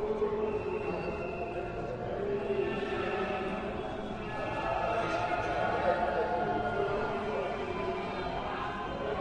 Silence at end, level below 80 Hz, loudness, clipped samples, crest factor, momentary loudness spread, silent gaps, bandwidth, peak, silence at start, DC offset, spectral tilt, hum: 0 s; -50 dBFS; -33 LUFS; under 0.1%; 18 dB; 6 LU; none; 9.6 kHz; -16 dBFS; 0 s; under 0.1%; -6.5 dB/octave; none